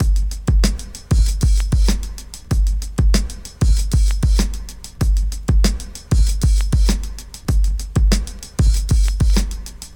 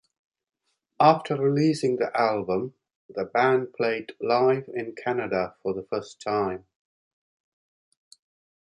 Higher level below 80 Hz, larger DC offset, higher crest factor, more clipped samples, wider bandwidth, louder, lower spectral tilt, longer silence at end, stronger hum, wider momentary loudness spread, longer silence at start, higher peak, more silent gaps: first, -16 dBFS vs -66 dBFS; neither; second, 16 dB vs 22 dB; neither; first, 16.5 kHz vs 11.5 kHz; first, -19 LUFS vs -25 LUFS; second, -5 dB/octave vs -6.5 dB/octave; second, 0 s vs 2.05 s; neither; about the same, 10 LU vs 11 LU; second, 0 s vs 1 s; first, 0 dBFS vs -4 dBFS; second, none vs 2.96-3.09 s